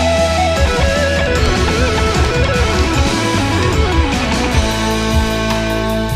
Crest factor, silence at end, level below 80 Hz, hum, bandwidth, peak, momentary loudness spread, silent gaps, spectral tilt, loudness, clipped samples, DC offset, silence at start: 12 dB; 0 s; -20 dBFS; none; 15.5 kHz; -2 dBFS; 2 LU; none; -5 dB/octave; -14 LUFS; under 0.1%; under 0.1%; 0 s